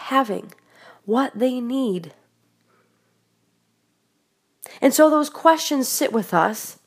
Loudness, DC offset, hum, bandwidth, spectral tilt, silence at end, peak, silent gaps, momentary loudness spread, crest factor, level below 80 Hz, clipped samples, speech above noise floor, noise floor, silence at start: -20 LUFS; under 0.1%; none; 15.5 kHz; -3.5 dB/octave; 0.15 s; 0 dBFS; none; 15 LU; 22 dB; -80 dBFS; under 0.1%; 49 dB; -69 dBFS; 0 s